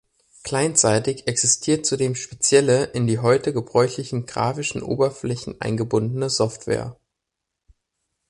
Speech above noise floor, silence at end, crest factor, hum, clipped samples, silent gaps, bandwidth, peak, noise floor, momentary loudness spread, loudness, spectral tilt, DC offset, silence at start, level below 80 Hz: 61 dB; 1.35 s; 18 dB; none; under 0.1%; none; 11.5 kHz; -4 dBFS; -82 dBFS; 10 LU; -21 LUFS; -4 dB/octave; under 0.1%; 0.45 s; -54 dBFS